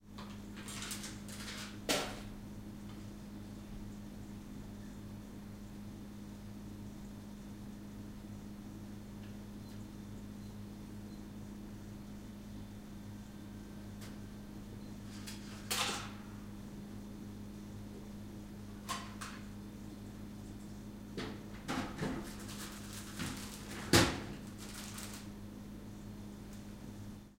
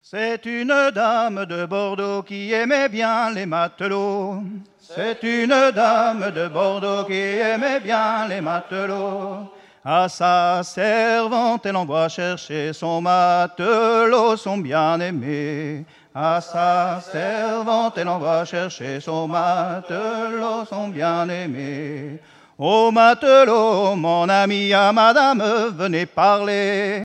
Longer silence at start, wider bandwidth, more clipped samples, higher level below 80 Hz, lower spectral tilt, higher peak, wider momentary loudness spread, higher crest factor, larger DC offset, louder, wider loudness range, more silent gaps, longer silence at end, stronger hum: second, 0 s vs 0.15 s; first, 16 kHz vs 10.5 kHz; neither; first, -56 dBFS vs -72 dBFS; about the same, -4 dB/octave vs -5 dB/octave; second, -10 dBFS vs -2 dBFS; about the same, 11 LU vs 11 LU; first, 32 dB vs 18 dB; neither; second, -43 LUFS vs -19 LUFS; first, 12 LU vs 7 LU; neither; about the same, 0 s vs 0 s; neither